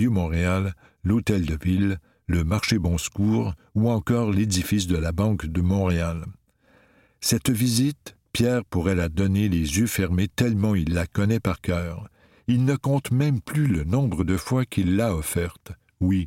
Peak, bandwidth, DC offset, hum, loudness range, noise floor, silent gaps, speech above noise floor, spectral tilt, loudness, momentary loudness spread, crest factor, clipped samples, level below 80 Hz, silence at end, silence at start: -6 dBFS; 17 kHz; under 0.1%; none; 2 LU; -60 dBFS; none; 37 dB; -6 dB/octave; -24 LUFS; 6 LU; 18 dB; under 0.1%; -38 dBFS; 0 s; 0 s